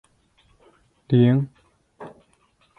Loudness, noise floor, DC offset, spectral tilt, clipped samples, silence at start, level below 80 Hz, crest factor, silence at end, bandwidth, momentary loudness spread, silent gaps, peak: -20 LUFS; -63 dBFS; under 0.1%; -10 dB/octave; under 0.1%; 1.1 s; -60 dBFS; 20 dB; 0.7 s; 4.2 kHz; 26 LU; none; -6 dBFS